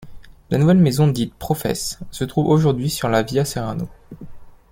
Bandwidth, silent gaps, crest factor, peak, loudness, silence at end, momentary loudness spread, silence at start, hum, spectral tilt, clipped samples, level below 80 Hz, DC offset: 16.5 kHz; none; 16 dB; -2 dBFS; -19 LUFS; 0.15 s; 13 LU; 0 s; none; -6.5 dB/octave; under 0.1%; -44 dBFS; under 0.1%